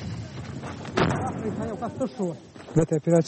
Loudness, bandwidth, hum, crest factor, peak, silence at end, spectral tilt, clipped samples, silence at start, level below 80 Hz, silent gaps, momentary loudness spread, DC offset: -28 LUFS; 8.8 kHz; none; 18 dB; -8 dBFS; 0 s; -7 dB/octave; under 0.1%; 0 s; -50 dBFS; none; 12 LU; under 0.1%